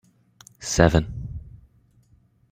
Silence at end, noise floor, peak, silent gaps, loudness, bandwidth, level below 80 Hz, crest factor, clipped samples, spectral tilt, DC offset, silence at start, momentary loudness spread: 0.95 s; -60 dBFS; -2 dBFS; none; -22 LUFS; 16 kHz; -38 dBFS; 24 dB; under 0.1%; -5.5 dB/octave; under 0.1%; 0.6 s; 19 LU